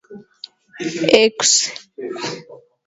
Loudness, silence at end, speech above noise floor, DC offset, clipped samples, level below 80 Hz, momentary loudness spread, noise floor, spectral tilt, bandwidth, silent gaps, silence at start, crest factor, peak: -16 LUFS; 0.3 s; 25 dB; under 0.1%; under 0.1%; -62 dBFS; 24 LU; -42 dBFS; -1.5 dB/octave; 8 kHz; none; 0.1 s; 20 dB; 0 dBFS